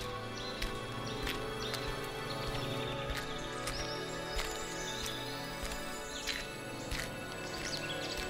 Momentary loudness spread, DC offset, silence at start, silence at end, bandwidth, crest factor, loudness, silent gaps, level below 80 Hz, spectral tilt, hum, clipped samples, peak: 3 LU; under 0.1%; 0 s; 0 s; 16 kHz; 20 dB; -39 LUFS; none; -48 dBFS; -3.5 dB/octave; none; under 0.1%; -20 dBFS